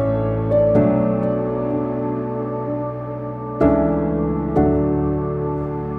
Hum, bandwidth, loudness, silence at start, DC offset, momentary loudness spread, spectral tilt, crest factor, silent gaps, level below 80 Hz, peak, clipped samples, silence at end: none; 4.2 kHz; -20 LUFS; 0 s; under 0.1%; 9 LU; -11.5 dB/octave; 16 dB; none; -34 dBFS; -4 dBFS; under 0.1%; 0 s